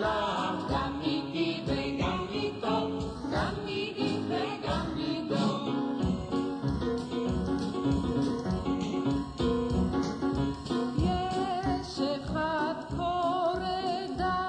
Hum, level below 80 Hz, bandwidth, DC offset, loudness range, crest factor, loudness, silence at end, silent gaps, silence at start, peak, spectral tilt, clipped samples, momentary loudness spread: none; -44 dBFS; 10 kHz; under 0.1%; 1 LU; 14 dB; -31 LUFS; 0 s; none; 0 s; -16 dBFS; -6.5 dB/octave; under 0.1%; 3 LU